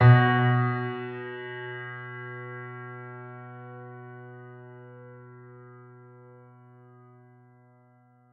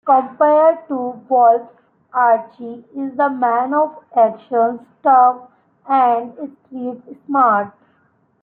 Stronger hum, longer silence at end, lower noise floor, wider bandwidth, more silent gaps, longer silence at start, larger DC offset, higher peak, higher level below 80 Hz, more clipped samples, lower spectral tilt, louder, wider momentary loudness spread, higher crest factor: neither; first, 3.15 s vs 0.75 s; about the same, -60 dBFS vs -59 dBFS; about the same, 4.4 kHz vs 4 kHz; neither; about the same, 0 s vs 0.05 s; neither; second, -6 dBFS vs -2 dBFS; first, -64 dBFS vs -74 dBFS; neither; about the same, -10 dB/octave vs -10 dB/octave; second, -28 LUFS vs -16 LUFS; first, 26 LU vs 18 LU; first, 22 dB vs 14 dB